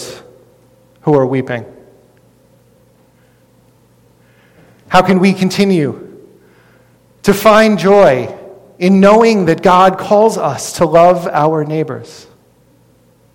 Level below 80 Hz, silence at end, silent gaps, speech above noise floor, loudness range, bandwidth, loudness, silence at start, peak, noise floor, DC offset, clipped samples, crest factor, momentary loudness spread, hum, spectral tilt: -46 dBFS; 1.2 s; none; 40 dB; 11 LU; 17.5 kHz; -11 LUFS; 0 s; 0 dBFS; -50 dBFS; under 0.1%; under 0.1%; 14 dB; 14 LU; none; -6 dB/octave